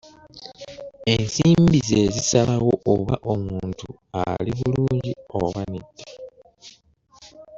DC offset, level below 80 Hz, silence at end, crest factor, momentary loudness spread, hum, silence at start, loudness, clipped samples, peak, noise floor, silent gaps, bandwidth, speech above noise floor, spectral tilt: under 0.1%; -46 dBFS; 0 s; 20 dB; 22 LU; none; 0.35 s; -21 LUFS; under 0.1%; -4 dBFS; -56 dBFS; none; 7.8 kHz; 35 dB; -5.5 dB/octave